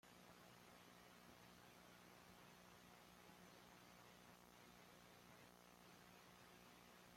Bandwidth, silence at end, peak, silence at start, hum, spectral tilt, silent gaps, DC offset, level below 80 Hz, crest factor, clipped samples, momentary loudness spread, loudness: 16 kHz; 0 s; -50 dBFS; 0.05 s; 60 Hz at -75 dBFS; -3.5 dB/octave; none; under 0.1%; -84 dBFS; 16 dB; under 0.1%; 1 LU; -66 LUFS